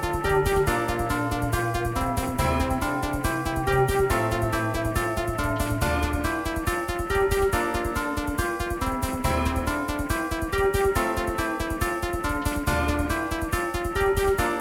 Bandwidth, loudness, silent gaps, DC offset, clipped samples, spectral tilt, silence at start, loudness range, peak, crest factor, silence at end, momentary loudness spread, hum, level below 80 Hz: 17.5 kHz; -25 LUFS; none; under 0.1%; under 0.1%; -5.5 dB/octave; 0 s; 1 LU; -10 dBFS; 16 dB; 0 s; 5 LU; none; -34 dBFS